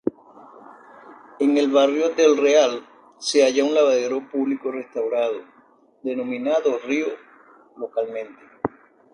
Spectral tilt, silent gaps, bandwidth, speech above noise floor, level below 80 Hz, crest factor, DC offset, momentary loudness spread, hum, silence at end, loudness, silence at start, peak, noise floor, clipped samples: -3.5 dB/octave; none; 10.5 kHz; 36 dB; -70 dBFS; 20 dB; under 0.1%; 14 LU; none; 0.45 s; -21 LUFS; 0.05 s; -4 dBFS; -56 dBFS; under 0.1%